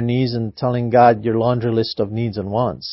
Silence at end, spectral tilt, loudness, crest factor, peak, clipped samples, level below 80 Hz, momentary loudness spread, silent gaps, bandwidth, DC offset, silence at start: 0 s; -11 dB/octave; -18 LUFS; 18 dB; 0 dBFS; under 0.1%; -48 dBFS; 9 LU; none; 5.8 kHz; under 0.1%; 0 s